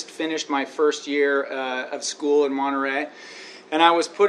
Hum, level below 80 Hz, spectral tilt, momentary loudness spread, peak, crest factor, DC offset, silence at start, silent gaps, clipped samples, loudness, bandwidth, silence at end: none; -84 dBFS; -2 dB/octave; 11 LU; -2 dBFS; 20 dB; under 0.1%; 0 s; none; under 0.1%; -22 LUFS; 11 kHz; 0 s